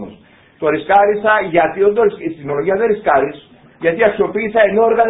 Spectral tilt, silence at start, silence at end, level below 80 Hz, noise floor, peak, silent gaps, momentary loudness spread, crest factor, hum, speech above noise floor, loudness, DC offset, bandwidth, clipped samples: -9.5 dB/octave; 0 s; 0 s; -50 dBFS; -44 dBFS; 0 dBFS; none; 9 LU; 14 dB; none; 30 dB; -15 LUFS; under 0.1%; 4 kHz; under 0.1%